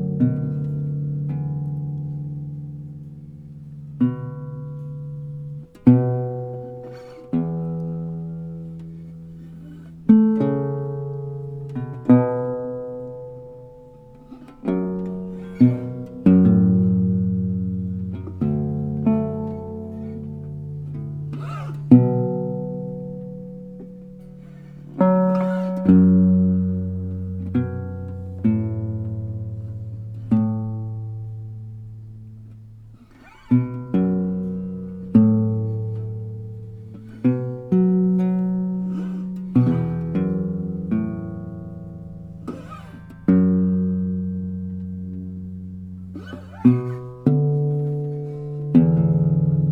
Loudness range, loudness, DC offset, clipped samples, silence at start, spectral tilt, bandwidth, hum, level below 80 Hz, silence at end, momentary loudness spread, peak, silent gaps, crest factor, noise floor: 9 LU; -22 LUFS; under 0.1%; under 0.1%; 0 s; -12 dB/octave; 3.6 kHz; none; -50 dBFS; 0 s; 21 LU; 0 dBFS; none; 22 dB; -47 dBFS